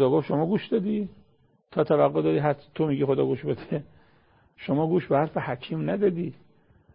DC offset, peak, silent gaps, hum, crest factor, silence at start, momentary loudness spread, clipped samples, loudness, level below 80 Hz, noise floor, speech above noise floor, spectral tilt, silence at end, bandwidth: under 0.1%; -8 dBFS; none; none; 18 dB; 0 s; 11 LU; under 0.1%; -26 LUFS; -62 dBFS; -63 dBFS; 38 dB; -12 dB/octave; 0.6 s; 5.4 kHz